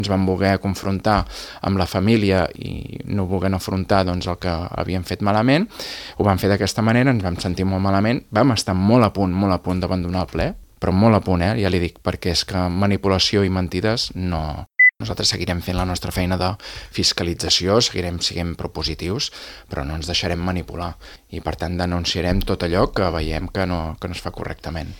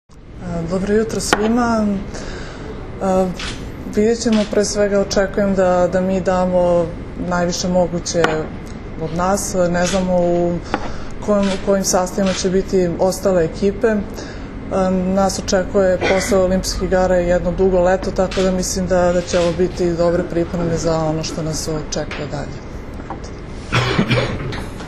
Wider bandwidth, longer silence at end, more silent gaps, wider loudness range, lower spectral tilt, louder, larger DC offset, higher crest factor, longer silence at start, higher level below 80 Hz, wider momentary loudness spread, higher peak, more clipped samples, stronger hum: first, 18 kHz vs 13.5 kHz; about the same, 0 s vs 0 s; neither; about the same, 4 LU vs 4 LU; about the same, -5 dB/octave vs -5 dB/octave; about the same, -20 LUFS vs -18 LUFS; neither; about the same, 20 dB vs 18 dB; about the same, 0 s vs 0.1 s; second, -38 dBFS vs -32 dBFS; about the same, 12 LU vs 13 LU; about the same, 0 dBFS vs 0 dBFS; neither; neither